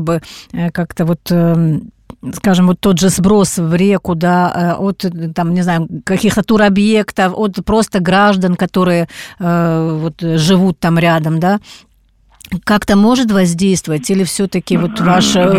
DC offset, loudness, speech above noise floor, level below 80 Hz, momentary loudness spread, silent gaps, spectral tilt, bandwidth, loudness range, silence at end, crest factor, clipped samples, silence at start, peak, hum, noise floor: 0.3%; -13 LUFS; 38 dB; -40 dBFS; 8 LU; none; -5.5 dB/octave; 15.5 kHz; 2 LU; 0 s; 12 dB; under 0.1%; 0 s; -2 dBFS; none; -51 dBFS